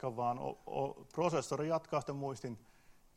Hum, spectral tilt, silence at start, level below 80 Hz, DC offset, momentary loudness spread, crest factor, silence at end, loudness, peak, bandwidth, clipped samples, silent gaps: none; -6 dB/octave; 0 s; -70 dBFS; under 0.1%; 9 LU; 18 dB; 0.25 s; -38 LUFS; -20 dBFS; 16 kHz; under 0.1%; none